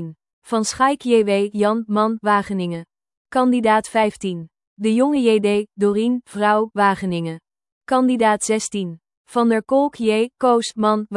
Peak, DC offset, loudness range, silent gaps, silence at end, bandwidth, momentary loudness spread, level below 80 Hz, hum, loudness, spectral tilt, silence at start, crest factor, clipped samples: -4 dBFS; under 0.1%; 1 LU; 0.33-0.42 s, 3.17-3.25 s, 4.67-4.76 s, 7.72-7.81 s, 9.17-9.25 s; 0 s; 12 kHz; 10 LU; -60 dBFS; none; -19 LUFS; -5 dB/octave; 0 s; 16 dB; under 0.1%